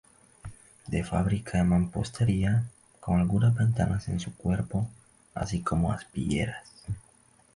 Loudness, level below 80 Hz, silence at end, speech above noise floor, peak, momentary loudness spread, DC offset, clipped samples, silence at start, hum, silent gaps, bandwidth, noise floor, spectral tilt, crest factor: -28 LUFS; -44 dBFS; 0.55 s; 34 dB; -12 dBFS; 17 LU; under 0.1%; under 0.1%; 0.45 s; none; none; 11.5 kHz; -61 dBFS; -7 dB/octave; 16 dB